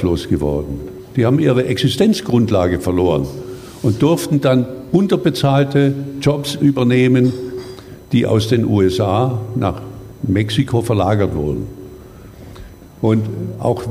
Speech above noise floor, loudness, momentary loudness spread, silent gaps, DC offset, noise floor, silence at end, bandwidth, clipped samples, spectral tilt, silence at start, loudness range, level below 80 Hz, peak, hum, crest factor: 22 dB; -16 LUFS; 15 LU; none; under 0.1%; -37 dBFS; 0 s; 16 kHz; under 0.1%; -7 dB/octave; 0 s; 4 LU; -38 dBFS; -2 dBFS; none; 14 dB